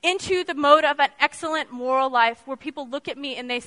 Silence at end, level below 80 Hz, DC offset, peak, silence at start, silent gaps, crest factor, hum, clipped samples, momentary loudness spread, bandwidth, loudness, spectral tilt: 0 s; -64 dBFS; under 0.1%; -2 dBFS; 0.05 s; none; 22 dB; none; under 0.1%; 15 LU; 11 kHz; -22 LUFS; -2.5 dB/octave